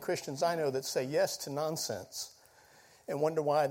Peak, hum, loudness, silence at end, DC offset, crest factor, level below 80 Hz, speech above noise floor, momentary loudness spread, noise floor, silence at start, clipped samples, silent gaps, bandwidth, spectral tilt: -18 dBFS; none; -34 LUFS; 0 s; under 0.1%; 16 dB; -76 dBFS; 28 dB; 11 LU; -61 dBFS; 0 s; under 0.1%; none; 16.5 kHz; -4 dB/octave